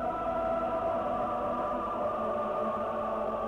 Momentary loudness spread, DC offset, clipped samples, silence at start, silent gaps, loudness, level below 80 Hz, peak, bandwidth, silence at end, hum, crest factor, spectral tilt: 2 LU; under 0.1%; under 0.1%; 0 s; none; -32 LUFS; -54 dBFS; -22 dBFS; 11 kHz; 0 s; none; 10 dB; -7.5 dB/octave